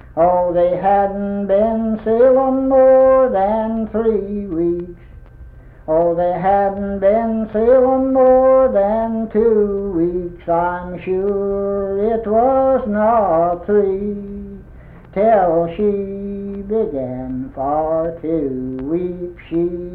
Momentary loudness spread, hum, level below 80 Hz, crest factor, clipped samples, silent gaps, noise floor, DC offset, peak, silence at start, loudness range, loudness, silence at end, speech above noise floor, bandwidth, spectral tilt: 12 LU; none; -40 dBFS; 12 dB; under 0.1%; none; -39 dBFS; under 0.1%; -4 dBFS; 0.05 s; 5 LU; -16 LUFS; 0 s; 23 dB; 3.8 kHz; -11 dB/octave